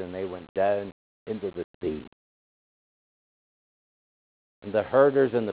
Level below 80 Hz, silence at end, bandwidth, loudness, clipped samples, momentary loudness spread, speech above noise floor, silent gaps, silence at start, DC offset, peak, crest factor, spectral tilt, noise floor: -60 dBFS; 0 s; 4 kHz; -26 LUFS; under 0.1%; 18 LU; over 64 dB; 0.49-0.55 s, 0.92-1.26 s, 1.64-1.81 s, 2.07-4.62 s; 0 s; under 0.1%; -6 dBFS; 22 dB; -10.5 dB/octave; under -90 dBFS